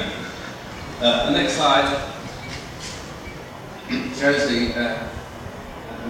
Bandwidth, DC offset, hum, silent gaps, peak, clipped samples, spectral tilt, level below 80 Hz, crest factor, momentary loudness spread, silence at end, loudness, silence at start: 17 kHz; under 0.1%; none; none; -4 dBFS; under 0.1%; -4 dB/octave; -42 dBFS; 20 dB; 18 LU; 0 s; -22 LUFS; 0 s